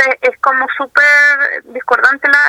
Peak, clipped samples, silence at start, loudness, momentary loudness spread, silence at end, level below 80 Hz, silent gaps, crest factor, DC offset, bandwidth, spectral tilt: 0 dBFS; 0.2%; 0 s; -10 LUFS; 9 LU; 0 s; -60 dBFS; none; 12 dB; under 0.1%; 16 kHz; -1 dB/octave